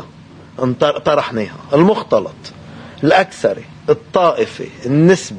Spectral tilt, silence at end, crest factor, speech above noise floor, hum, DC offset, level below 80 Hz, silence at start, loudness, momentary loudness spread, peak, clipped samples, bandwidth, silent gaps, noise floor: -6 dB/octave; 0 s; 16 dB; 24 dB; none; under 0.1%; -52 dBFS; 0 s; -15 LUFS; 18 LU; 0 dBFS; under 0.1%; 10 kHz; none; -39 dBFS